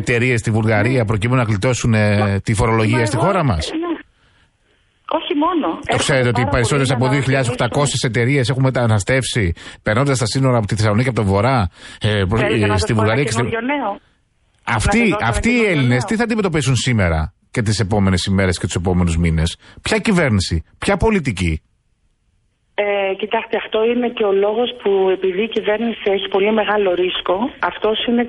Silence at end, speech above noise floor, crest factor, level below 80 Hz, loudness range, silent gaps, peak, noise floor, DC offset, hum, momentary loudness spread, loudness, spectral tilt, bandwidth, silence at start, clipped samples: 0 s; 46 dB; 14 dB; -34 dBFS; 3 LU; none; -4 dBFS; -62 dBFS; under 0.1%; none; 6 LU; -17 LUFS; -5.5 dB/octave; 11.5 kHz; 0 s; under 0.1%